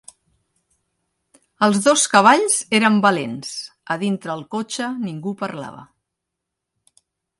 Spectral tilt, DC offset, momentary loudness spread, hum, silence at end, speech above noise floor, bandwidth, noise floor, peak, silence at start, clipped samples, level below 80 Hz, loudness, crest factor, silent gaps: -3.5 dB/octave; under 0.1%; 16 LU; none; 1.55 s; 63 dB; 11.5 kHz; -81 dBFS; 0 dBFS; 1.6 s; under 0.1%; -68 dBFS; -18 LUFS; 20 dB; none